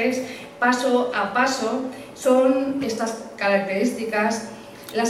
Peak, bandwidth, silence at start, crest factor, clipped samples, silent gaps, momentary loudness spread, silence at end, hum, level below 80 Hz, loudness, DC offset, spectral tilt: -8 dBFS; 15 kHz; 0 s; 16 dB; under 0.1%; none; 11 LU; 0 s; none; -64 dBFS; -22 LUFS; under 0.1%; -4 dB/octave